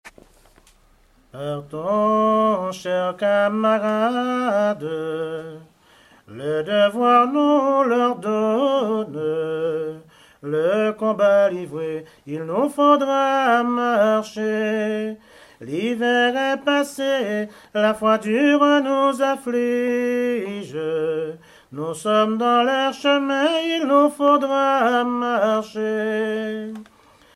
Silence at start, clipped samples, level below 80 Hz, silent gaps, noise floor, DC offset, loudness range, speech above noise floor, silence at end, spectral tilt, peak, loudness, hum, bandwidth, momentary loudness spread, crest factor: 0.05 s; under 0.1%; -64 dBFS; none; -56 dBFS; under 0.1%; 3 LU; 36 dB; 0.55 s; -5 dB/octave; -4 dBFS; -20 LUFS; none; 13.5 kHz; 13 LU; 18 dB